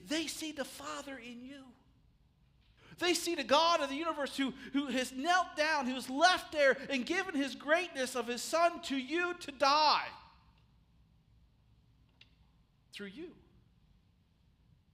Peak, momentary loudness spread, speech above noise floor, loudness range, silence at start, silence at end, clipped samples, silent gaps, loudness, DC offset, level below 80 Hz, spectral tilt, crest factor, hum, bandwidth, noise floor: -14 dBFS; 19 LU; 36 dB; 5 LU; 0 s; 1.6 s; under 0.1%; none; -32 LUFS; under 0.1%; -70 dBFS; -2 dB/octave; 22 dB; none; 15.5 kHz; -69 dBFS